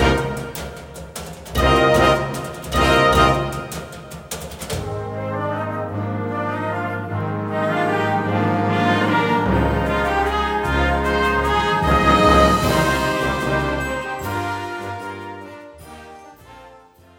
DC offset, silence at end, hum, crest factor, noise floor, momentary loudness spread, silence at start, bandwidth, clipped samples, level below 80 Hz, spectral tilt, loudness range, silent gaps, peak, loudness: under 0.1%; 0.4 s; none; 18 dB; -47 dBFS; 18 LU; 0 s; 17 kHz; under 0.1%; -32 dBFS; -5.5 dB/octave; 9 LU; none; -2 dBFS; -19 LUFS